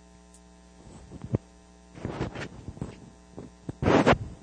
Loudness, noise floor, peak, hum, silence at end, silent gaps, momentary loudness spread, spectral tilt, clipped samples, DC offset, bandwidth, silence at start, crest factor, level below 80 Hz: -28 LUFS; -53 dBFS; -8 dBFS; none; 0.05 s; none; 27 LU; -6.5 dB/octave; under 0.1%; under 0.1%; 10 kHz; 0.85 s; 24 dB; -46 dBFS